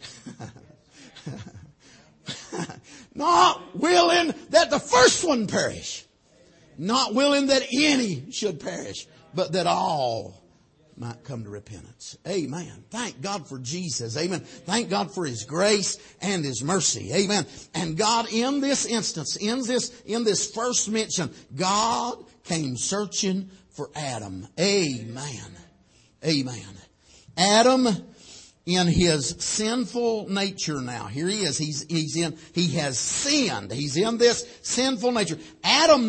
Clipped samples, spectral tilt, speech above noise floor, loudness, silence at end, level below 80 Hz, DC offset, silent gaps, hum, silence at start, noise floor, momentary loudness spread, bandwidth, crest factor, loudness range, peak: under 0.1%; -3.5 dB/octave; 35 dB; -24 LUFS; 0 s; -54 dBFS; under 0.1%; none; none; 0 s; -59 dBFS; 18 LU; 8.8 kHz; 20 dB; 8 LU; -4 dBFS